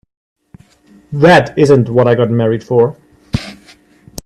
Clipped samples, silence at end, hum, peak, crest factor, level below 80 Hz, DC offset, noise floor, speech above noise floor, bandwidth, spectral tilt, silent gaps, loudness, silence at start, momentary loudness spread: under 0.1%; 0.7 s; none; 0 dBFS; 14 dB; -42 dBFS; under 0.1%; -46 dBFS; 36 dB; 14 kHz; -7 dB/octave; none; -12 LUFS; 1.1 s; 15 LU